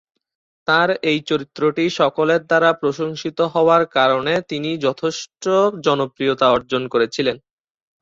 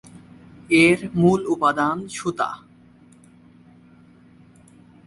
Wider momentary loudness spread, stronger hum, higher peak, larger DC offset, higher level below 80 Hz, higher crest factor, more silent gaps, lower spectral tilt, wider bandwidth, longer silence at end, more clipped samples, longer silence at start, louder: second, 9 LU vs 12 LU; neither; about the same, -2 dBFS vs -4 dBFS; neither; about the same, -58 dBFS vs -56 dBFS; about the same, 16 dB vs 20 dB; neither; about the same, -5 dB/octave vs -5.5 dB/octave; second, 7.8 kHz vs 11.5 kHz; second, 0.65 s vs 2.5 s; neither; about the same, 0.7 s vs 0.7 s; about the same, -18 LUFS vs -20 LUFS